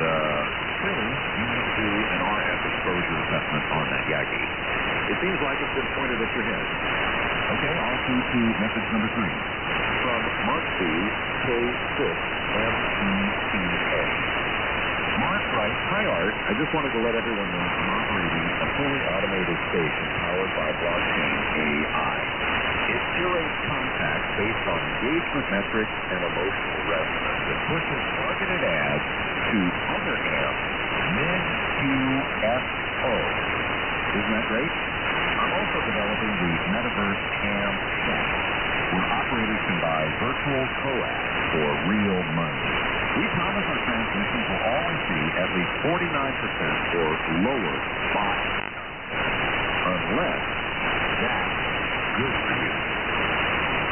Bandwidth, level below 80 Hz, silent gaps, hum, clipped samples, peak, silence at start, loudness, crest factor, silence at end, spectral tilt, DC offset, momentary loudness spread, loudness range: 3.4 kHz; -42 dBFS; none; none; under 0.1%; -12 dBFS; 0 s; -24 LUFS; 14 dB; 0 s; -1 dB/octave; under 0.1%; 2 LU; 1 LU